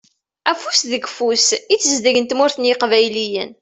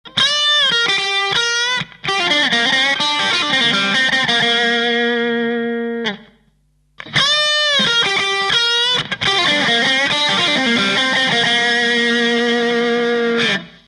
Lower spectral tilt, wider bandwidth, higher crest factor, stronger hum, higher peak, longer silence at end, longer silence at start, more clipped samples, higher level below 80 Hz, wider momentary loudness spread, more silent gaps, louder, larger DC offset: about the same, -1 dB/octave vs -2 dB/octave; second, 8.4 kHz vs 11.5 kHz; about the same, 16 dB vs 14 dB; neither; about the same, 0 dBFS vs -2 dBFS; about the same, 0.1 s vs 0.2 s; first, 0.45 s vs 0.05 s; neither; second, -64 dBFS vs -54 dBFS; about the same, 7 LU vs 6 LU; neither; about the same, -16 LUFS vs -14 LUFS; neither